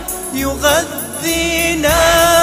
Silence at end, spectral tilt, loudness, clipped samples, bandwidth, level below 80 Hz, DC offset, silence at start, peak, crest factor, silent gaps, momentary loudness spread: 0 s; -2.5 dB/octave; -14 LUFS; under 0.1%; 16 kHz; -30 dBFS; under 0.1%; 0 s; 0 dBFS; 14 dB; none; 10 LU